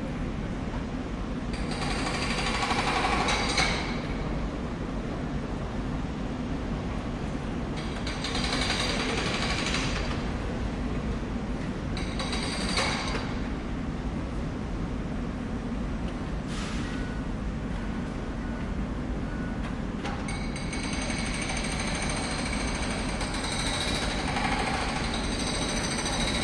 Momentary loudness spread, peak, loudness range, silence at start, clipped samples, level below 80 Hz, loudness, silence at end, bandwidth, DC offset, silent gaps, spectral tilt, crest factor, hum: 7 LU; -10 dBFS; 6 LU; 0 s; under 0.1%; -36 dBFS; -30 LUFS; 0 s; 11.5 kHz; under 0.1%; none; -4 dB/octave; 20 dB; none